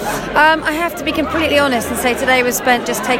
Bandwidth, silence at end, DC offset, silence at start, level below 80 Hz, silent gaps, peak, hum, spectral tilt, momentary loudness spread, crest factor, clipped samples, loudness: 16.5 kHz; 0 s; under 0.1%; 0 s; -40 dBFS; none; 0 dBFS; none; -3 dB/octave; 6 LU; 16 dB; under 0.1%; -14 LUFS